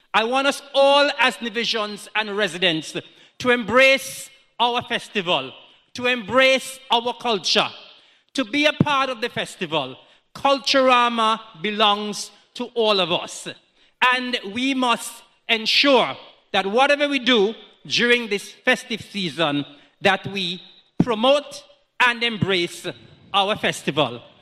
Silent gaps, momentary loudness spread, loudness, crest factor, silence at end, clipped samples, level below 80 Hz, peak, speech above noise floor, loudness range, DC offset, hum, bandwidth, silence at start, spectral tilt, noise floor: none; 15 LU; -20 LUFS; 18 dB; 0.2 s; under 0.1%; -62 dBFS; -4 dBFS; 31 dB; 3 LU; under 0.1%; none; 14 kHz; 0.15 s; -3.5 dB/octave; -51 dBFS